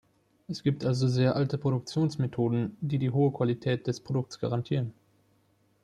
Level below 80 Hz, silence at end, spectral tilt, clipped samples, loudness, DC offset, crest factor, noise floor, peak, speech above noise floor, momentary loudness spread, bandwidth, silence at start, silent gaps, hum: -64 dBFS; 0.9 s; -7.5 dB/octave; under 0.1%; -29 LUFS; under 0.1%; 16 dB; -68 dBFS; -12 dBFS; 40 dB; 6 LU; 10 kHz; 0.5 s; none; none